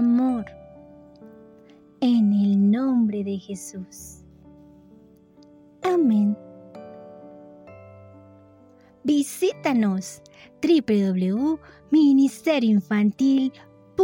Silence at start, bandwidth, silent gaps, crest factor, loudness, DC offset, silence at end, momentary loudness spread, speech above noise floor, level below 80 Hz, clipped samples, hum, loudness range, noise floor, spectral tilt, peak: 0 s; 17 kHz; none; 14 dB; -22 LUFS; under 0.1%; 0 s; 22 LU; 32 dB; -62 dBFS; under 0.1%; none; 8 LU; -53 dBFS; -6.5 dB/octave; -10 dBFS